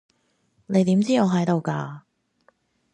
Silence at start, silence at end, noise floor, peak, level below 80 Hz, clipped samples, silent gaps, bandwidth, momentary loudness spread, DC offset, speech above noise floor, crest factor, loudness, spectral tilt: 0.7 s; 0.95 s; -67 dBFS; -6 dBFS; -68 dBFS; under 0.1%; none; 10 kHz; 14 LU; under 0.1%; 47 dB; 18 dB; -22 LUFS; -7 dB/octave